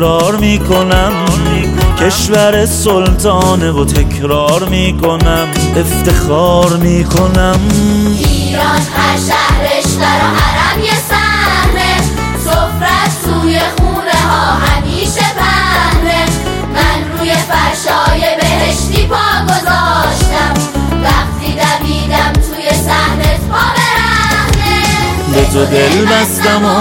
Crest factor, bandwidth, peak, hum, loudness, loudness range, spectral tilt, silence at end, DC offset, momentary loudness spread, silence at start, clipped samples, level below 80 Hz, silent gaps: 10 dB; 17 kHz; 0 dBFS; none; -10 LUFS; 1 LU; -4.5 dB/octave; 0 s; under 0.1%; 3 LU; 0 s; under 0.1%; -18 dBFS; none